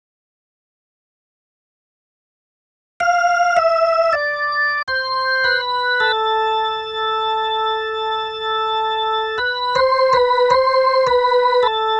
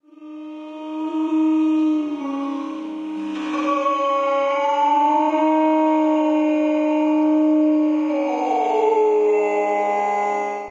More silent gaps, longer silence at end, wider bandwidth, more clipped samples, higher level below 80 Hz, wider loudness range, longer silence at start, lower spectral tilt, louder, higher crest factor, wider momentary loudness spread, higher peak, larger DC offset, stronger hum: first, 4.83-4.87 s vs none; about the same, 0 s vs 0 s; first, 8.8 kHz vs 7.4 kHz; neither; first, -54 dBFS vs -76 dBFS; about the same, 4 LU vs 5 LU; first, 3 s vs 0.2 s; second, -1.5 dB/octave vs -5 dB/octave; about the same, -17 LUFS vs -19 LUFS; about the same, 16 dB vs 12 dB; second, 6 LU vs 11 LU; first, -2 dBFS vs -8 dBFS; neither; neither